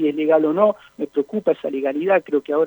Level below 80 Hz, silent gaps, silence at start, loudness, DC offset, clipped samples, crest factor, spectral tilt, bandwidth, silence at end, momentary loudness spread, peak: -72 dBFS; none; 0 s; -20 LUFS; under 0.1%; under 0.1%; 16 dB; -8 dB/octave; over 20 kHz; 0 s; 7 LU; -4 dBFS